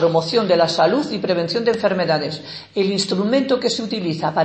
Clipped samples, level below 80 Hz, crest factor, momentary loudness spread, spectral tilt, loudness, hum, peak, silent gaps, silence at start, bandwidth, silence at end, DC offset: under 0.1%; -64 dBFS; 16 dB; 6 LU; -5 dB/octave; -19 LUFS; none; -2 dBFS; none; 0 s; 8.8 kHz; 0 s; under 0.1%